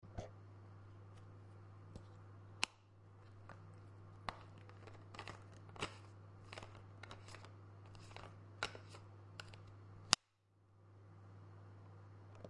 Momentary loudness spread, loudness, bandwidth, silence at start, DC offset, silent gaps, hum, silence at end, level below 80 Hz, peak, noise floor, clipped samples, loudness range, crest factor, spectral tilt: 16 LU; -48 LUFS; 11 kHz; 0 s; under 0.1%; none; none; 0 s; -70 dBFS; -6 dBFS; -75 dBFS; under 0.1%; 9 LU; 44 dB; -2 dB/octave